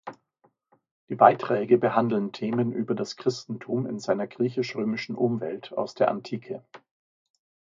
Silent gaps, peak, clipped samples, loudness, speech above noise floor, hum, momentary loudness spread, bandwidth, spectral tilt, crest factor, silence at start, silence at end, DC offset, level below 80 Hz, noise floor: 0.91-1.07 s; -2 dBFS; under 0.1%; -26 LUFS; 42 dB; none; 15 LU; 7.6 kHz; -6.5 dB/octave; 26 dB; 0.05 s; 1 s; under 0.1%; -74 dBFS; -68 dBFS